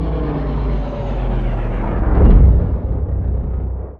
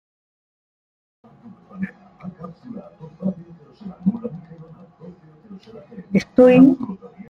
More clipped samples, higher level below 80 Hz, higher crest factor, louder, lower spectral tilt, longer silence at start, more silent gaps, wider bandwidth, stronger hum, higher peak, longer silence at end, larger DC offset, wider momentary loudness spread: neither; first, -16 dBFS vs -58 dBFS; second, 14 dB vs 20 dB; about the same, -18 LUFS vs -17 LUFS; first, -11 dB/octave vs -8.5 dB/octave; second, 0 s vs 1.75 s; neither; second, 4.2 kHz vs 6.6 kHz; neither; about the same, 0 dBFS vs -2 dBFS; second, 0.05 s vs 0.35 s; neither; second, 11 LU vs 26 LU